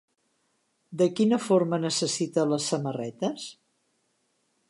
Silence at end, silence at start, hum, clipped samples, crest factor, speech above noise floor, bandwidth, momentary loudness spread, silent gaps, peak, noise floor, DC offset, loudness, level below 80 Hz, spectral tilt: 1.2 s; 0.9 s; none; under 0.1%; 18 dB; 47 dB; 11.5 kHz; 11 LU; none; -10 dBFS; -73 dBFS; under 0.1%; -26 LUFS; -80 dBFS; -5 dB/octave